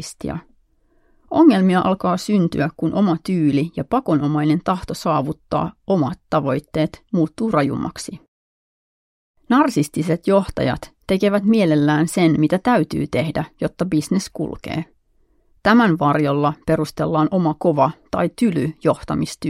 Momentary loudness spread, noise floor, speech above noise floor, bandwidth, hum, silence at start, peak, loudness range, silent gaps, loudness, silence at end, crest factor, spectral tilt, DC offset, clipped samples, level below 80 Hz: 9 LU; -59 dBFS; 41 dB; 15.5 kHz; none; 0 s; -2 dBFS; 4 LU; 8.28-9.34 s; -19 LUFS; 0 s; 18 dB; -7 dB/octave; under 0.1%; under 0.1%; -46 dBFS